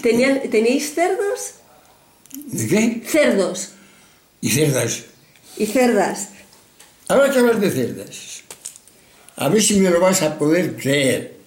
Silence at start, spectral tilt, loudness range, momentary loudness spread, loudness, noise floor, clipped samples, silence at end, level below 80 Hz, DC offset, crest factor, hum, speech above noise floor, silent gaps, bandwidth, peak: 0 s; -4 dB/octave; 3 LU; 18 LU; -18 LUFS; -52 dBFS; under 0.1%; 0.15 s; -58 dBFS; under 0.1%; 16 dB; none; 34 dB; none; 17 kHz; -4 dBFS